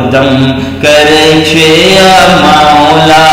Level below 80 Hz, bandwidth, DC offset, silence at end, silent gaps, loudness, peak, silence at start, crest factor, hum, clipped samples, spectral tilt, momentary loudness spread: -32 dBFS; 18.5 kHz; under 0.1%; 0 s; none; -4 LUFS; 0 dBFS; 0 s; 4 dB; none; 9%; -4 dB/octave; 5 LU